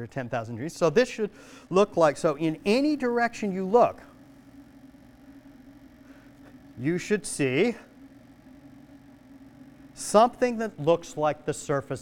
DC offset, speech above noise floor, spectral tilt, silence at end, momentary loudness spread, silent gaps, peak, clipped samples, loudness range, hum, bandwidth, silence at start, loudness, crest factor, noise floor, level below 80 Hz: under 0.1%; 26 dB; -5.5 dB/octave; 0 s; 11 LU; none; -6 dBFS; under 0.1%; 7 LU; none; 16.5 kHz; 0 s; -26 LUFS; 22 dB; -51 dBFS; -60 dBFS